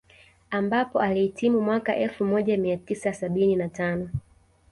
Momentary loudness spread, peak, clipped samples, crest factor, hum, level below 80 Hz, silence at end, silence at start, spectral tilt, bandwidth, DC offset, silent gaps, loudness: 6 LU; -10 dBFS; under 0.1%; 14 dB; none; -54 dBFS; 0.5 s; 0.5 s; -7 dB/octave; 11.5 kHz; under 0.1%; none; -25 LUFS